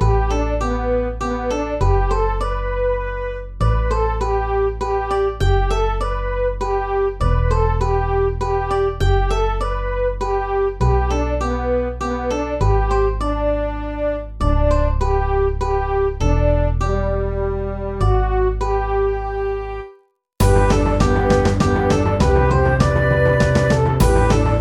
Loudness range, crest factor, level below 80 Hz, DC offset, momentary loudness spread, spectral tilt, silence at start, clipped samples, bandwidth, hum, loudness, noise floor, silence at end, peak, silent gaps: 5 LU; 16 dB; -22 dBFS; under 0.1%; 7 LU; -7 dB/octave; 0 s; under 0.1%; 16 kHz; none; -19 LUFS; -51 dBFS; 0 s; 0 dBFS; none